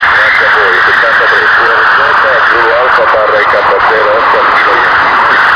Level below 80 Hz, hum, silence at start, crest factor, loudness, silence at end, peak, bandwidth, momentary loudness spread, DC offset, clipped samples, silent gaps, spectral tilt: -40 dBFS; none; 0 s; 6 dB; -6 LUFS; 0 s; 0 dBFS; 5.4 kHz; 2 LU; under 0.1%; 2%; none; -3.5 dB/octave